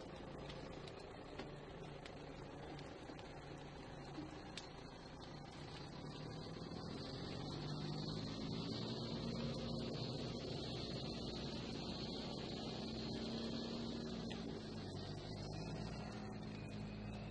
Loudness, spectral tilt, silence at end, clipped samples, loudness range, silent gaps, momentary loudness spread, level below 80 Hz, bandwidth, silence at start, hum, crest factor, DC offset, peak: -48 LUFS; -6 dB/octave; 0 s; under 0.1%; 7 LU; none; 8 LU; -62 dBFS; 11 kHz; 0 s; none; 16 dB; under 0.1%; -30 dBFS